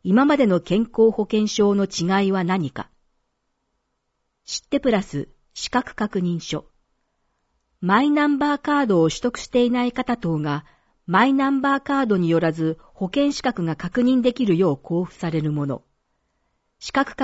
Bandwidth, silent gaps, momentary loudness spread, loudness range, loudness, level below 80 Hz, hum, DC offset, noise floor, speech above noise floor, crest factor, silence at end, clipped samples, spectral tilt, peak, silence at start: 8 kHz; none; 12 LU; 5 LU; -21 LUFS; -52 dBFS; none; under 0.1%; -74 dBFS; 54 dB; 16 dB; 0 s; under 0.1%; -6 dB/octave; -4 dBFS; 0.05 s